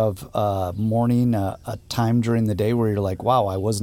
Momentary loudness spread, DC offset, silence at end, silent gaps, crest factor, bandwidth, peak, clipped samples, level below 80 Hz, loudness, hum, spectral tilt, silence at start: 5 LU; under 0.1%; 0 s; none; 16 dB; 16.5 kHz; -6 dBFS; under 0.1%; -48 dBFS; -22 LUFS; none; -7 dB/octave; 0 s